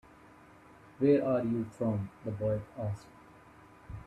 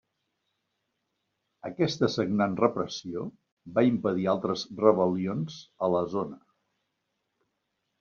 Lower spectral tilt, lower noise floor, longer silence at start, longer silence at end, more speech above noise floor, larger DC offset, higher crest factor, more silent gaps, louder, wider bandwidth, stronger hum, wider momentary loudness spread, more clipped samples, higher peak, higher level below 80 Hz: first, -9.5 dB/octave vs -6 dB/octave; second, -57 dBFS vs -80 dBFS; second, 1 s vs 1.65 s; second, 0 s vs 1.65 s; second, 26 dB vs 53 dB; neither; about the same, 20 dB vs 24 dB; second, none vs 3.52-3.57 s; second, -32 LUFS vs -28 LUFS; first, 11.5 kHz vs 7.2 kHz; neither; about the same, 12 LU vs 13 LU; neither; second, -14 dBFS vs -6 dBFS; first, -60 dBFS vs -68 dBFS